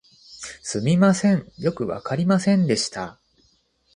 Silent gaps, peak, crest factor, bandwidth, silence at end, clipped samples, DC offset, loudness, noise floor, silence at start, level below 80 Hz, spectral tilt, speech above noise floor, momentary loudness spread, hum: none; -8 dBFS; 16 dB; 11 kHz; 0.85 s; under 0.1%; under 0.1%; -21 LUFS; -63 dBFS; 0.3 s; -58 dBFS; -6 dB/octave; 43 dB; 16 LU; none